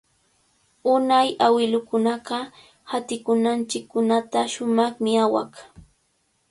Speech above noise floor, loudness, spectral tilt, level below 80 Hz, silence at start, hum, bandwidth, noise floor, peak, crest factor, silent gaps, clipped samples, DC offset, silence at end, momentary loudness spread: 47 dB; -22 LUFS; -4 dB/octave; -64 dBFS; 0.85 s; none; 11.5 kHz; -68 dBFS; -4 dBFS; 18 dB; none; under 0.1%; under 0.1%; 0.85 s; 11 LU